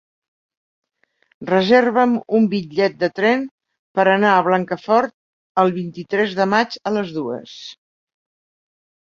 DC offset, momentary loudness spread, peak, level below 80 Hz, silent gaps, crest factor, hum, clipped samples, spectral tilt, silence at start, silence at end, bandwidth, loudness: under 0.1%; 14 LU; -2 dBFS; -64 dBFS; 3.51-3.58 s, 3.79-3.95 s, 5.14-5.55 s; 18 dB; none; under 0.1%; -6.5 dB/octave; 1.4 s; 1.35 s; 7.4 kHz; -18 LUFS